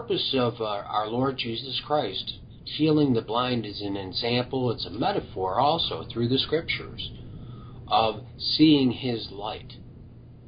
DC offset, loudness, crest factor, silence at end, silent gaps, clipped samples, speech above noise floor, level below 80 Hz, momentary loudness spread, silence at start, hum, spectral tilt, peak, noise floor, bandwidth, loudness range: under 0.1%; -26 LUFS; 18 dB; 0 s; none; under 0.1%; 20 dB; -50 dBFS; 14 LU; 0 s; none; -10 dB/octave; -8 dBFS; -46 dBFS; 5.2 kHz; 2 LU